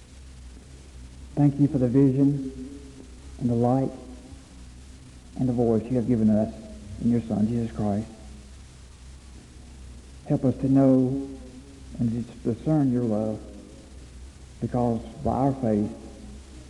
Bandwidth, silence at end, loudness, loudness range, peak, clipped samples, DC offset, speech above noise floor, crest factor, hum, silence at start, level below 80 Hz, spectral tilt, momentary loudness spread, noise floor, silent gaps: 11.5 kHz; 0 s; -25 LUFS; 5 LU; -10 dBFS; under 0.1%; under 0.1%; 22 dB; 16 dB; none; 0.1 s; -46 dBFS; -9 dB/octave; 25 LU; -46 dBFS; none